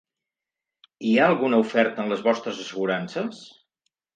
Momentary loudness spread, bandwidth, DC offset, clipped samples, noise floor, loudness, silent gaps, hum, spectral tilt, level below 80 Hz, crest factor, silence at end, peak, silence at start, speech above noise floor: 12 LU; 9 kHz; under 0.1%; under 0.1%; -88 dBFS; -23 LUFS; none; none; -5.5 dB/octave; -76 dBFS; 20 dB; 0.7 s; -4 dBFS; 1 s; 65 dB